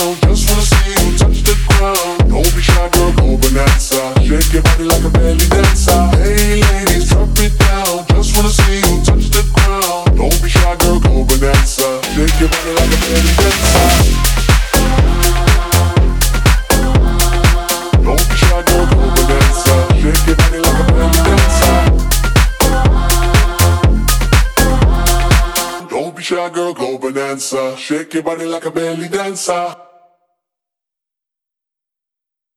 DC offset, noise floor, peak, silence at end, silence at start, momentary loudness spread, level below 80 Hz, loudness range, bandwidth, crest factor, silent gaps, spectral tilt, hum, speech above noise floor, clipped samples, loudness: under 0.1%; -84 dBFS; 0 dBFS; 2.85 s; 0 s; 8 LU; -14 dBFS; 8 LU; 19.5 kHz; 10 dB; none; -4.5 dB/octave; none; 66 dB; under 0.1%; -12 LUFS